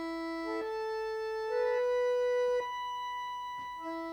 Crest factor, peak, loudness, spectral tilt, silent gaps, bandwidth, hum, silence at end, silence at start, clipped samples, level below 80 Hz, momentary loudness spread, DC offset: 12 dB; -22 dBFS; -34 LUFS; -3.5 dB/octave; none; 19.5 kHz; 50 Hz at -70 dBFS; 0 s; 0 s; under 0.1%; -68 dBFS; 9 LU; under 0.1%